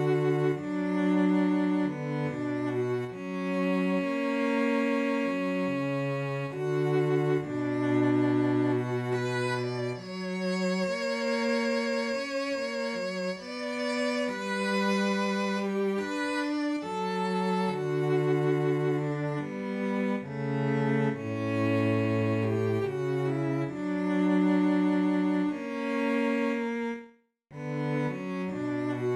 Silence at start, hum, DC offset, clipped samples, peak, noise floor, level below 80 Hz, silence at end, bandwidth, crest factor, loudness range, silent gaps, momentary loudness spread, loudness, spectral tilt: 0 s; none; under 0.1%; under 0.1%; -16 dBFS; -56 dBFS; -70 dBFS; 0 s; 12 kHz; 14 dB; 3 LU; none; 7 LU; -29 LUFS; -7 dB/octave